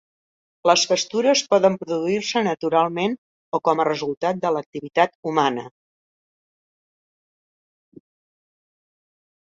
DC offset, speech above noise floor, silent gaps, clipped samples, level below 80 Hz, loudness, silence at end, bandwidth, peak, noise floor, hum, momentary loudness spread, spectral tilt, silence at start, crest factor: under 0.1%; over 69 dB; 3.18-3.52 s, 4.17-4.21 s, 4.66-4.73 s, 5.15-5.23 s; under 0.1%; -70 dBFS; -21 LUFS; 3.75 s; 8 kHz; -2 dBFS; under -90 dBFS; none; 8 LU; -3.5 dB/octave; 0.65 s; 22 dB